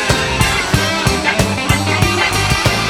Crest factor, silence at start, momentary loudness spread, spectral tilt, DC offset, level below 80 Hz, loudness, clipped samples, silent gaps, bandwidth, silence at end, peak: 14 dB; 0 s; 1 LU; -3.5 dB/octave; under 0.1%; -26 dBFS; -14 LUFS; under 0.1%; none; 18.5 kHz; 0 s; 0 dBFS